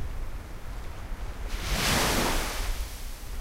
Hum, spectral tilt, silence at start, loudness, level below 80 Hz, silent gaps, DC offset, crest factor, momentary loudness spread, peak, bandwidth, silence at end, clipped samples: none; -3 dB/octave; 0 s; -29 LUFS; -34 dBFS; none; under 0.1%; 16 dB; 17 LU; -14 dBFS; 16 kHz; 0 s; under 0.1%